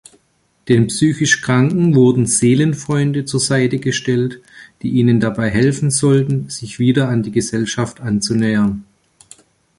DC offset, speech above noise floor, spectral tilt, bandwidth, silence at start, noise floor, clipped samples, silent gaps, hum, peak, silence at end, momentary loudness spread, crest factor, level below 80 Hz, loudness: under 0.1%; 46 dB; -5.5 dB/octave; 11.5 kHz; 0.65 s; -61 dBFS; under 0.1%; none; none; -2 dBFS; 0.95 s; 7 LU; 14 dB; -48 dBFS; -15 LUFS